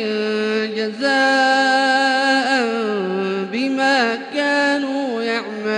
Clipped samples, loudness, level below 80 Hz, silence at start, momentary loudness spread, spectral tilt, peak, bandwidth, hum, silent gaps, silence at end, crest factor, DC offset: under 0.1%; -18 LUFS; -70 dBFS; 0 s; 7 LU; -3.5 dB/octave; -4 dBFS; 11 kHz; none; none; 0 s; 14 dB; under 0.1%